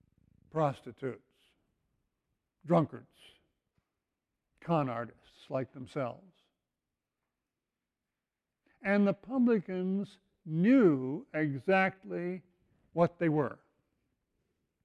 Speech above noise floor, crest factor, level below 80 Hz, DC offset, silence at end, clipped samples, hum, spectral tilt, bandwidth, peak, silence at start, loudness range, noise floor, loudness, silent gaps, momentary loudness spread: 59 dB; 20 dB; -74 dBFS; under 0.1%; 1.3 s; under 0.1%; none; -9 dB/octave; 9.6 kHz; -14 dBFS; 0.55 s; 10 LU; -90 dBFS; -32 LUFS; none; 14 LU